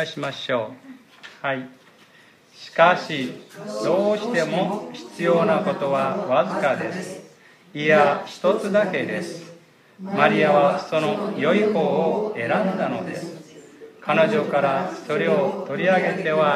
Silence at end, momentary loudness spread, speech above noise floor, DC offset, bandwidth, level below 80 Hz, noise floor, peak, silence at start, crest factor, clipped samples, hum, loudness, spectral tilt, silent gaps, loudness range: 0 s; 16 LU; 31 dB; under 0.1%; 13.5 kHz; -74 dBFS; -53 dBFS; -2 dBFS; 0 s; 20 dB; under 0.1%; none; -21 LUFS; -6 dB/octave; none; 3 LU